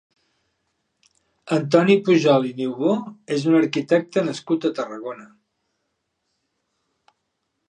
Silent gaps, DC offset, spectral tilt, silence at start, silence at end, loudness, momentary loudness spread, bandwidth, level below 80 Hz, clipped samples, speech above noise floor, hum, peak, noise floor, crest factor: none; under 0.1%; -6.5 dB/octave; 1.45 s; 2.45 s; -20 LUFS; 13 LU; 9.8 kHz; -74 dBFS; under 0.1%; 56 dB; none; -2 dBFS; -75 dBFS; 20 dB